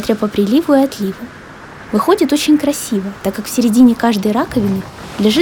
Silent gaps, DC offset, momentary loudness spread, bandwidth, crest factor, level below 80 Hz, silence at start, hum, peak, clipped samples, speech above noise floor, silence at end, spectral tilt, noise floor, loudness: none; under 0.1%; 18 LU; 19 kHz; 14 dB; -44 dBFS; 0 s; none; 0 dBFS; under 0.1%; 20 dB; 0 s; -5 dB/octave; -34 dBFS; -14 LUFS